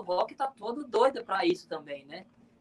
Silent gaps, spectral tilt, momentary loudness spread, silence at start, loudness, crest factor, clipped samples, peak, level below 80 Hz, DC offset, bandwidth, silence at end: none; -4.5 dB/octave; 16 LU; 0 s; -30 LUFS; 20 dB; under 0.1%; -12 dBFS; -76 dBFS; under 0.1%; 11.5 kHz; 0.4 s